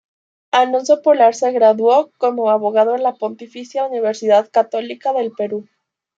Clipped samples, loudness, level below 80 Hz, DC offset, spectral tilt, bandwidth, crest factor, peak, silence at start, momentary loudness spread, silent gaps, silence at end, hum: under 0.1%; -16 LUFS; -76 dBFS; under 0.1%; -4 dB/octave; 7.8 kHz; 14 dB; -2 dBFS; 0.55 s; 11 LU; none; 0.55 s; none